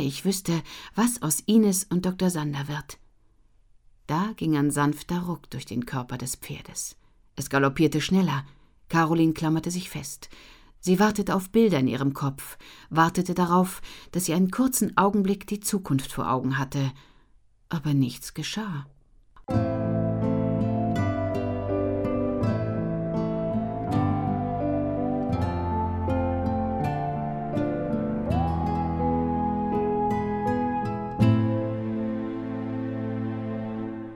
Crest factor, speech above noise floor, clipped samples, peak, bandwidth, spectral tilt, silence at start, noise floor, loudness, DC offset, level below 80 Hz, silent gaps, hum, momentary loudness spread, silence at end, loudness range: 20 dB; 34 dB; under 0.1%; -6 dBFS; 19.5 kHz; -6 dB/octave; 0 s; -59 dBFS; -26 LUFS; under 0.1%; -46 dBFS; none; none; 11 LU; 0 s; 4 LU